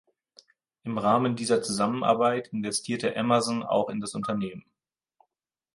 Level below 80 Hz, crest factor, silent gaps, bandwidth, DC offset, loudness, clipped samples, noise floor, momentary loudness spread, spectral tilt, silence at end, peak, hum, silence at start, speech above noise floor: -68 dBFS; 20 dB; none; 11.5 kHz; under 0.1%; -27 LUFS; under 0.1%; -80 dBFS; 8 LU; -4.5 dB/octave; 1.15 s; -8 dBFS; none; 0.85 s; 54 dB